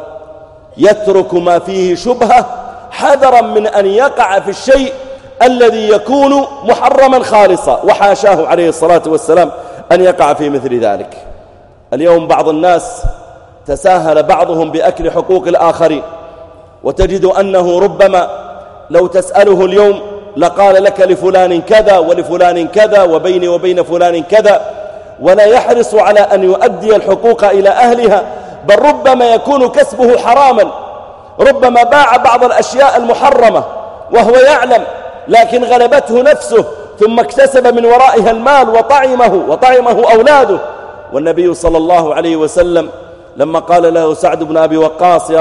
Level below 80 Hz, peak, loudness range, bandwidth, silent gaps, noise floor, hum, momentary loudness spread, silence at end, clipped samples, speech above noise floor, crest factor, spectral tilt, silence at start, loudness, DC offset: -34 dBFS; 0 dBFS; 4 LU; 11.5 kHz; none; -39 dBFS; none; 9 LU; 0 s; 1%; 31 dB; 8 dB; -5 dB/octave; 0 s; -8 LUFS; under 0.1%